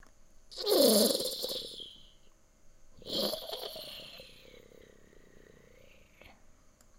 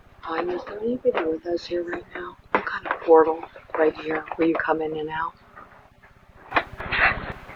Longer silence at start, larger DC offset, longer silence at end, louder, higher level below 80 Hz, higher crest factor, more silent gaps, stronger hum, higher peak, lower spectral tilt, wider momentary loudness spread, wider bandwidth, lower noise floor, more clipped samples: first, 0.5 s vs 0.25 s; neither; first, 2.4 s vs 0 s; second, -30 LUFS vs -24 LUFS; second, -62 dBFS vs -48 dBFS; about the same, 24 dB vs 22 dB; neither; neither; second, -10 dBFS vs -2 dBFS; second, -2.5 dB/octave vs -6.5 dB/octave; first, 24 LU vs 14 LU; first, 16 kHz vs 7 kHz; first, -60 dBFS vs -53 dBFS; neither